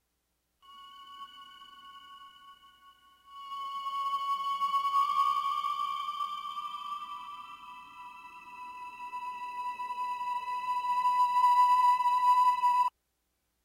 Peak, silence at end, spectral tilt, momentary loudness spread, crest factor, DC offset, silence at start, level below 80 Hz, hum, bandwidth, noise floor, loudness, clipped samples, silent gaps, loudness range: -16 dBFS; 0.75 s; 0 dB/octave; 24 LU; 16 dB; under 0.1%; 0.7 s; -78 dBFS; none; 16 kHz; -79 dBFS; -29 LUFS; under 0.1%; none; 16 LU